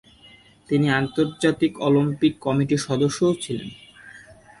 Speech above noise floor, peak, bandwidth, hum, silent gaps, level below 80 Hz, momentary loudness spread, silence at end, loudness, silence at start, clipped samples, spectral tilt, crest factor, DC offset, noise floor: 30 dB; -6 dBFS; 11.5 kHz; none; none; -56 dBFS; 7 LU; 0.4 s; -22 LUFS; 0.7 s; under 0.1%; -6 dB/octave; 16 dB; under 0.1%; -51 dBFS